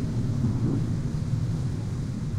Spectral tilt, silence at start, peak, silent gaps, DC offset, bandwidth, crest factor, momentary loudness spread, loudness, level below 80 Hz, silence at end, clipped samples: -8 dB/octave; 0 s; -14 dBFS; none; under 0.1%; 11 kHz; 14 dB; 5 LU; -28 LUFS; -38 dBFS; 0 s; under 0.1%